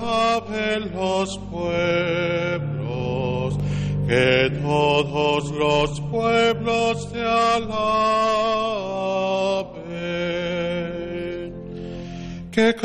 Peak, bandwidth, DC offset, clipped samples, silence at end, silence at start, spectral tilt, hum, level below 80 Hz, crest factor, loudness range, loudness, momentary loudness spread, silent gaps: -6 dBFS; 10 kHz; under 0.1%; under 0.1%; 0 s; 0 s; -5.5 dB/octave; none; -44 dBFS; 16 dB; 5 LU; -22 LUFS; 10 LU; none